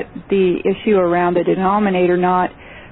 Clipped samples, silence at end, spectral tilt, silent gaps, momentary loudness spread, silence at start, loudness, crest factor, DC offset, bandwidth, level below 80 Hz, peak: under 0.1%; 0.05 s; -12.5 dB/octave; none; 4 LU; 0 s; -16 LUFS; 12 dB; under 0.1%; 4.1 kHz; -46 dBFS; -4 dBFS